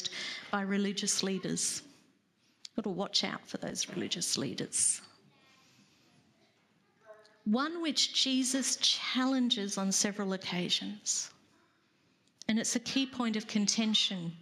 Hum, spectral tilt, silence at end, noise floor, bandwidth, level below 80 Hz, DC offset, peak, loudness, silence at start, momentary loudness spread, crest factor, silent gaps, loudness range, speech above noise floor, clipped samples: none; -2.5 dB/octave; 0 s; -71 dBFS; 14.5 kHz; -78 dBFS; under 0.1%; -14 dBFS; -31 LUFS; 0 s; 10 LU; 20 dB; none; 6 LU; 39 dB; under 0.1%